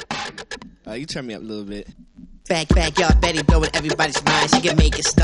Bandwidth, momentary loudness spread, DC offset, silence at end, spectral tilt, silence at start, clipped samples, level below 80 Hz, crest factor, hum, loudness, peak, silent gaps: 11.5 kHz; 18 LU; under 0.1%; 0 s; -4 dB/octave; 0 s; under 0.1%; -24 dBFS; 20 dB; none; -19 LUFS; 0 dBFS; none